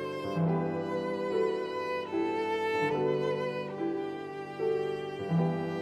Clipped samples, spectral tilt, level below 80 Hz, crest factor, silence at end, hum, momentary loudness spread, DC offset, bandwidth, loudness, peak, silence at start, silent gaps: under 0.1%; -7.5 dB/octave; -70 dBFS; 14 dB; 0 s; none; 5 LU; under 0.1%; 11.5 kHz; -32 LUFS; -18 dBFS; 0 s; none